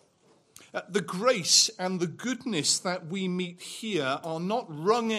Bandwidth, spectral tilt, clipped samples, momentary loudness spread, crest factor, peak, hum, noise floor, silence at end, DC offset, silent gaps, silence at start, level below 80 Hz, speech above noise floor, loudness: 15 kHz; -2.5 dB/octave; under 0.1%; 13 LU; 22 dB; -8 dBFS; none; -64 dBFS; 0 s; under 0.1%; none; 0.6 s; -78 dBFS; 35 dB; -27 LUFS